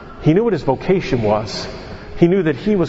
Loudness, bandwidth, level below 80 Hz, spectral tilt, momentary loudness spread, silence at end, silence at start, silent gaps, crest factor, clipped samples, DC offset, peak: -17 LUFS; 8 kHz; -38 dBFS; -7.5 dB/octave; 13 LU; 0 s; 0 s; none; 16 dB; under 0.1%; under 0.1%; 0 dBFS